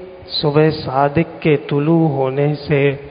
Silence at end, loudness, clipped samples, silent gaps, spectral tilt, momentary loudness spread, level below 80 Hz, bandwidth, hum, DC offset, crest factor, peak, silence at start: 0 s; -16 LUFS; under 0.1%; none; -12.5 dB/octave; 3 LU; -46 dBFS; 5.2 kHz; none; under 0.1%; 16 dB; 0 dBFS; 0 s